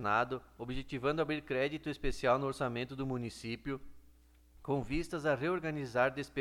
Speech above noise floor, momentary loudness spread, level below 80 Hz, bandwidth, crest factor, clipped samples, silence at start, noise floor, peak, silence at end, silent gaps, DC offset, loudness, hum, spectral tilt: 27 dB; 10 LU; -52 dBFS; 16 kHz; 18 dB; under 0.1%; 0 s; -62 dBFS; -16 dBFS; 0 s; none; under 0.1%; -36 LUFS; none; -6 dB/octave